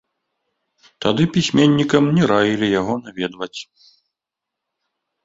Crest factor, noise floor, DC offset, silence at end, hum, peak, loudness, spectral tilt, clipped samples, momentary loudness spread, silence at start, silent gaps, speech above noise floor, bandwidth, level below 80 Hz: 18 dB; -84 dBFS; under 0.1%; 1.6 s; none; -2 dBFS; -17 LUFS; -6 dB/octave; under 0.1%; 13 LU; 1 s; none; 67 dB; 7.8 kHz; -54 dBFS